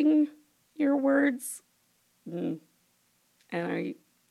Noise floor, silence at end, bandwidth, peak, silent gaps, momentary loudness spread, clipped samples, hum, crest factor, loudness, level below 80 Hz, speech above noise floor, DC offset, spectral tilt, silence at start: -70 dBFS; 0.35 s; 14.5 kHz; -14 dBFS; none; 18 LU; under 0.1%; 60 Hz at -60 dBFS; 16 dB; -29 LUFS; under -90 dBFS; 42 dB; under 0.1%; -5.5 dB/octave; 0 s